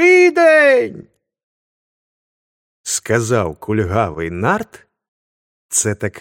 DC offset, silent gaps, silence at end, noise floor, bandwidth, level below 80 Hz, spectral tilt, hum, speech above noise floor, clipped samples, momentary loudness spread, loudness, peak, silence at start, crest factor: under 0.1%; 1.43-2.84 s, 5.08-5.69 s; 0 s; under -90 dBFS; 16.5 kHz; -48 dBFS; -4.5 dB/octave; none; over 71 dB; under 0.1%; 12 LU; -15 LUFS; 0 dBFS; 0 s; 16 dB